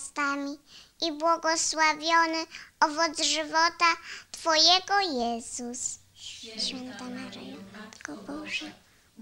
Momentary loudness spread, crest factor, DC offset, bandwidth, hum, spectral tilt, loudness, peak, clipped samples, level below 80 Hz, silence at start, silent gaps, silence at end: 19 LU; 22 dB; under 0.1%; 16 kHz; none; -0.5 dB/octave; -26 LUFS; -6 dBFS; under 0.1%; -64 dBFS; 0 s; none; 0.5 s